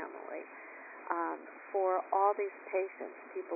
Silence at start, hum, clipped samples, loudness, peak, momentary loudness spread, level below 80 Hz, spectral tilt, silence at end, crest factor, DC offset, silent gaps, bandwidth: 0 s; none; under 0.1%; -35 LUFS; -16 dBFS; 17 LU; under -90 dBFS; -4 dB/octave; 0 s; 20 dB; under 0.1%; none; 2.7 kHz